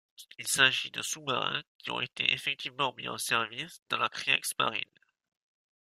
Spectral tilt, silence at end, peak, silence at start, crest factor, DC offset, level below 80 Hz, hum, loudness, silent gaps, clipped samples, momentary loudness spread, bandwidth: -1 dB/octave; 1 s; -8 dBFS; 0.2 s; 26 dB; under 0.1%; -76 dBFS; none; -30 LUFS; 1.67-1.79 s, 3.82-3.86 s; under 0.1%; 13 LU; 16 kHz